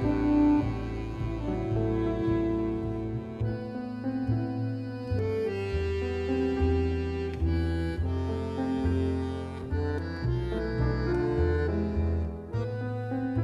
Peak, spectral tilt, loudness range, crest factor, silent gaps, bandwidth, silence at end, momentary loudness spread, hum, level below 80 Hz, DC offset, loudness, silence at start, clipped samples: -14 dBFS; -9 dB/octave; 2 LU; 14 dB; none; 8 kHz; 0 s; 7 LU; none; -38 dBFS; under 0.1%; -30 LUFS; 0 s; under 0.1%